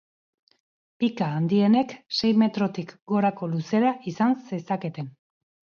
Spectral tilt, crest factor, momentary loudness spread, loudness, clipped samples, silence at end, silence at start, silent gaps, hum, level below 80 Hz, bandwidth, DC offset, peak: -7 dB/octave; 16 dB; 9 LU; -24 LUFS; under 0.1%; 0.7 s; 1 s; 3.02-3.06 s; none; -68 dBFS; 6.8 kHz; under 0.1%; -10 dBFS